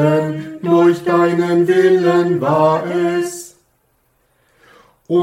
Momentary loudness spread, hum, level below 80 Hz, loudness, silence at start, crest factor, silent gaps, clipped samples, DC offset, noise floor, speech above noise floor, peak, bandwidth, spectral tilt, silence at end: 10 LU; none; -62 dBFS; -15 LUFS; 0 s; 14 dB; none; under 0.1%; under 0.1%; -61 dBFS; 47 dB; -2 dBFS; 13.5 kHz; -7 dB/octave; 0 s